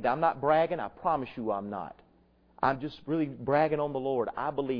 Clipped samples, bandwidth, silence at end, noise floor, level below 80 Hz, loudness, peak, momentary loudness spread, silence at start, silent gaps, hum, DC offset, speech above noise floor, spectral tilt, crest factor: under 0.1%; 5.4 kHz; 0 s; -64 dBFS; -62 dBFS; -30 LUFS; -10 dBFS; 8 LU; 0 s; none; none; under 0.1%; 34 dB; -9 dB/octave; 20 dB